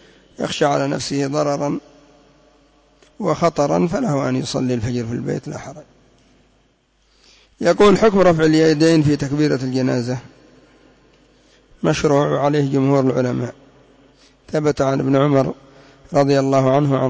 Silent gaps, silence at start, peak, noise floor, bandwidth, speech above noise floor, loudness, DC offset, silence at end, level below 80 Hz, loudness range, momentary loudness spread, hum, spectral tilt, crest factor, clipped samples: none; 0.4 s; -4 dBFS; -60 dBFS; 8 kHz; 43 dB; -18 LUFS; under 0.1%; 0 s; -48 dBFS; 7 LU; 12 LU; none; -6.5 dB/octave; 14 dB; under 0.1%